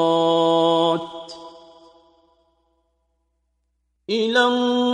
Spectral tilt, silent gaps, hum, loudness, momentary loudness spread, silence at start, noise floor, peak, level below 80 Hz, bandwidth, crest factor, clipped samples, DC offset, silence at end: -5 dB/octave; none; none; -19 LUFS; 20 LU; 0 s; -71 dBFS; -6 dBFS; -66 dBFS; 9.8 kHz; 16 dB; under 0.1%; under 0.1%; 0 s